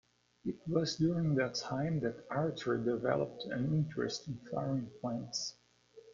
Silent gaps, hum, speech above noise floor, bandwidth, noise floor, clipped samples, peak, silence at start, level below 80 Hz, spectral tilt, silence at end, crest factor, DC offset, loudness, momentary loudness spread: none; 60 Hz at -55 dBFS; 26 dB; 7.4 kHz; -61 dBFS; under 0.1%; -16 dBFS; 0.45 s; -66 dBFS; -6 dB/octave; 0 s; 20 dB; under 0.1%; -36 LUFS; 8 LU